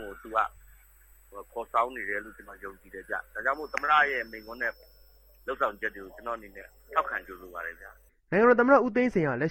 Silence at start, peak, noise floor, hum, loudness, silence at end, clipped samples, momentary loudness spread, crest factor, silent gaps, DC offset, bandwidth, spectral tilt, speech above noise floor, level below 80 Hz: 0 s; -8 dBFS; -57 dBFS; none; -28 LUFS; 0 s; under 0.1%; 22 LU; 22 dB; none; under 0.1%; 17 kHz; -6.5 dB/octave; 29 dB; -58 dBFS